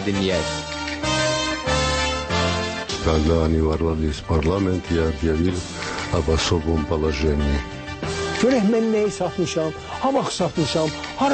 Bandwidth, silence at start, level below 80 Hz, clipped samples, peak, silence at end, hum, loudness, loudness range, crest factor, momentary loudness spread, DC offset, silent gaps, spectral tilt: 8.8 kHz; 0 s; -32 dBFS; under 0.1%; -6 dBFS; 0 s; none; -22 LUFS; 1 LU; 14 dB; 7 LU; under 0.1%; none; -5 dB/octave